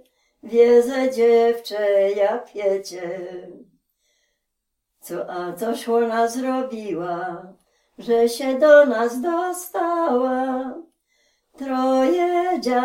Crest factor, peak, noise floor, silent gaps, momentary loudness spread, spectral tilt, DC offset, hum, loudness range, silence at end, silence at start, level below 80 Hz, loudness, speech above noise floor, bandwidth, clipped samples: 20 dB; -2 dBFS; -78 dBFS; none; 17 LU; -4.5 dB/octave; under 0.1%; none; 9 LU; 0 s; 0.45 s; -66 dBFS; -20 LUFS; 58 dB; 16.5 kHz; under 0.1%